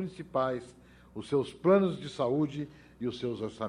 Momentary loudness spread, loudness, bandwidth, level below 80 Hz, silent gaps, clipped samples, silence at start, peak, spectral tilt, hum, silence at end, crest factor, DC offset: 15 LU; -31 LUFS; 11 kHz; -64 dBFS; none; under 0.1%; 0 s; -12 dBFS; -7.5 dB/octave; none; 0 s; 18 dB; under 0.1%